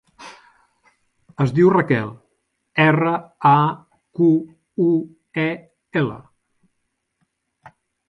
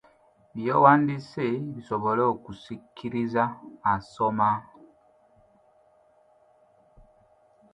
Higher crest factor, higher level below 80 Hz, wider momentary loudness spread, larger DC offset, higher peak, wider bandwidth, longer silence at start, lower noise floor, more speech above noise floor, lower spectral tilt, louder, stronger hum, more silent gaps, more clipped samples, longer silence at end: about the same, 20 dB vs 24 dB; about the same, -60 dBFS vs -64 dBFS; first, 21 LU vs 18 LU; neither; about the same, -2 dBFS vs -4 dBFS; second, 7.2 kHz vs 10 kHz; second, 0.2 s vs 0.55 s; first, -74 dBFS vs -61 dBFS; first, 56 dB vs 36 dB; about the same, -8.5 dB/octave vs -8 dB/octave; first, -19 LUFS vs -25 LUFS; neither; neither; neither; second, 0.4 s vs 3.1 s